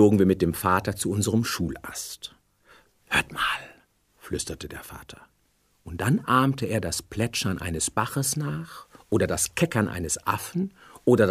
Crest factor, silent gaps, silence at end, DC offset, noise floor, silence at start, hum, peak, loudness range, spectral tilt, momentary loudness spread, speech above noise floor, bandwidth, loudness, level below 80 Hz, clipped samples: 20 dB; none; 0 s; under 0.1%; -67 dBFS; 0 s; none; -6 dBFS; 5 LU; -4.5 dB/octave; 16 LU; 41 dB; 15.5 kHz; -26 LUFS; -50 dBFS; under 0.1%